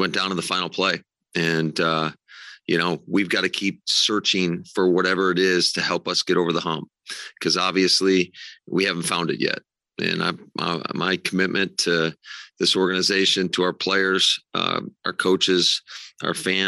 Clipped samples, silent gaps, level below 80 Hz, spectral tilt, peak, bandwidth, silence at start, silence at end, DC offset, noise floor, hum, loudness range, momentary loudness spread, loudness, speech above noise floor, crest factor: under 0.1%; none; -70 dBFS; -3.5 dB/octave; -6 dBFS; 12.5 kHz; 0 s; 0 s; under 0.1%; -45 dBFS; none; 3 LU; 11 LU; -21 LUFS; 22 dB; 16 dB